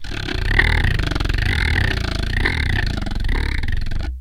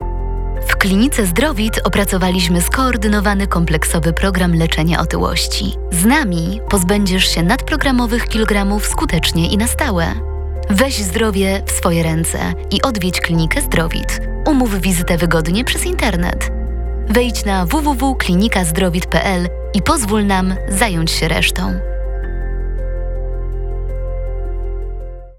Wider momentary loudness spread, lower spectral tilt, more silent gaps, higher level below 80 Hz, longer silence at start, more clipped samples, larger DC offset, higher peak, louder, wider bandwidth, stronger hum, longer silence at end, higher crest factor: about the same, 8 LU vs 10 LU; about the same, -5 dB/octave vs -4.5 dB/octave; neither; about the same, -22 dBFS vs -22 dBFS; about the same, 0 s vs 0 s; neither; second, under 0.1% vs 0.2%; about the same, 0 dBFS vs 0 dBFS; second, -21 LUFS vs -16 LUFS; about the same, 16 kHz vs 17.5 kHz; neither; about the same, 0 s vs 0.05 s; about the same, 18 dB vs 16 dB